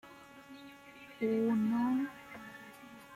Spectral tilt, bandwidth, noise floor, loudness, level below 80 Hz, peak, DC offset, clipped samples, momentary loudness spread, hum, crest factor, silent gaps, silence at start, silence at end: -7 dB/octave; 14.5 kHz; -54 dBFS; -33 LUFS; -76 dBFS; -22 dBFS; under 0.1%; under 0.1%; 22 LU; none; 14 dB; none; 0.05 s; 0 s